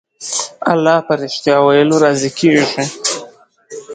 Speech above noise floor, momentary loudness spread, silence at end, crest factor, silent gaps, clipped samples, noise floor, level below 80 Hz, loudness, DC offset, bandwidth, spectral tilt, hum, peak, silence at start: 27 dB; 10 LU; 0 s; 14 dB; none; under 0.1%; -40 dBFS; -60 dBFS; -14 LUFS; under 0.1%; 9.6 kHz; -4 dB/octave; none; 0 dBFS; 0.2 s